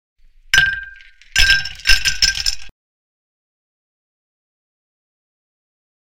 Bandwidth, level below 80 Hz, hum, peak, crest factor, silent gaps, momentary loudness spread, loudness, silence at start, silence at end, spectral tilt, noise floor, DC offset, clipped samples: 17 kHz; -32 dBFS; none; 0 dBFS; 20 dB; none; 14 LU; -15 LUFS; 0.55 s; 3.3 s; 1 dB/octave; -41 dBFS; under 0.1%; under 0.1%